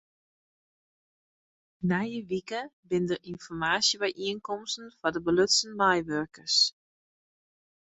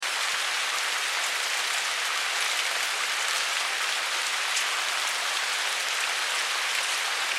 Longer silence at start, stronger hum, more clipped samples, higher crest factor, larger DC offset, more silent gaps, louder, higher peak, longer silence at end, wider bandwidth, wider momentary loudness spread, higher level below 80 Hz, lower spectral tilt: first, 1.8 s vs 0 s; neither; neither; about the same, 20 dB vs 18 dB; neither; first, 2.73-2.83 s vs none; second, -28 LUFS vs -25 LUFS; about the same, -10 dBFS vs -10 dBFS; first, 1.2 s vs 0 s; second, 8.4 kHz vs 16 kHz; first, 12 LU vs 1 LU; first, -64 dBFS vs -90 dBFS; first, -3 dB/octave vs 4.5 dB/octave